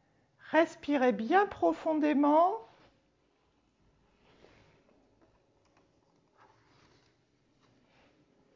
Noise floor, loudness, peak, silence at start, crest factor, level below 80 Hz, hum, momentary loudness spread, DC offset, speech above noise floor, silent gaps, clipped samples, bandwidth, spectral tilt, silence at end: -72 dBFS; -29 LUFS; -12 dBFS; 0.5 s; 20 dB; -72 dBFS; none; 5 LU; under 0.1%; 45 dB; none; under 0.1%; 7.6 kHz; -6 dB/octave; 5.9 s